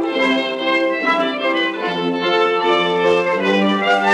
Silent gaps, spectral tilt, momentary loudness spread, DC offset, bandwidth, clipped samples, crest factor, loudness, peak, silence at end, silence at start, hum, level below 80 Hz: none; -5 dB/octave; 3 LU; under 0.1%; 11 kHz; under 0.1%; 14 dB; -17 LUFS; -4 dBFS; 0 s; 0 s; none; -68 dBFS